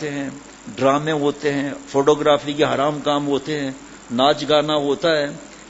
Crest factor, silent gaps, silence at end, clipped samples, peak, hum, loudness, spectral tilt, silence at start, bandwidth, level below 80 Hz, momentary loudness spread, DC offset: 18 dB; none; 0 s; under 0.1%; -2 dBFS; none; -20 LUFS; -5 dB/octave; 0 s; 8 kHz; -54 dBFS; 12 LU; under 0.1%